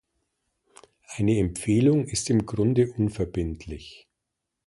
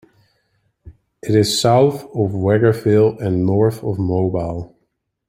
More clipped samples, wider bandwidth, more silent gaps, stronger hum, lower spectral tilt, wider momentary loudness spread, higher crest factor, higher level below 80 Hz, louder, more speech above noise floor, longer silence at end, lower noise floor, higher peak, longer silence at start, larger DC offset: neither; second, 11.5 kHz vs 16 kHz; neither; neither; about the same, -6.5 dB/octave vs -6 dB/octave; first, 18 LU vs 10 LU; about the same, 18 dB vs 16 dB; first, -44 dBFS vs -50 dBFS; second, -24 LUFS vs -17 LUFS; first, 59 dB vs 54 dB; about the same, 0.75 s vs 0.65 s; first, -83 dBFS vs -70 dBFS; second, -8 dBFS vs -2 dBFS; first, 1.1 s vs 0.85 s; neither